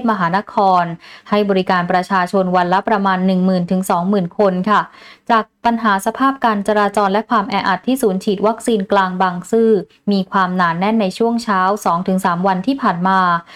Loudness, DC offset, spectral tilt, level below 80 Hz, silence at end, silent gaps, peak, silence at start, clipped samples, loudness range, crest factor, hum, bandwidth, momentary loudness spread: -16 LUFS; under 0.1%; -6 dB/octave; -54 dBFS; 0 s; none; -2 dBFS; 0 s; under 0.1%; 1 LU; 12 dB; none; 15 kHz; 3 LU